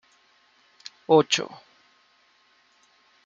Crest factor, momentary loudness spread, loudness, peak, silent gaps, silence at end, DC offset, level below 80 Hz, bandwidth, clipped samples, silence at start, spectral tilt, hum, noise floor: 24 dB; 25 LU; -21 LUFS; -4 dBFS; none; 1.7 s; under 0.1%; -80 dBFS; 7.8 kHz; under 0.1%; 1.1 s; -3.5 dB/octave; none; -63 dBFS